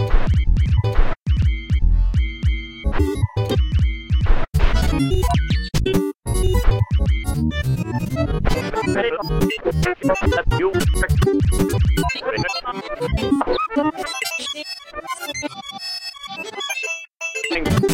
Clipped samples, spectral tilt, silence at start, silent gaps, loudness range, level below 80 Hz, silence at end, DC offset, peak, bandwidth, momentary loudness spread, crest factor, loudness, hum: under 0.1%; -6 dB/octave; 0 s; none; 5 LU; -22 dBFS; 0 s; under 0.1%; -2 dBFS; 16.5 kHz; 8 LU; 16 dB; -21 LUFS; none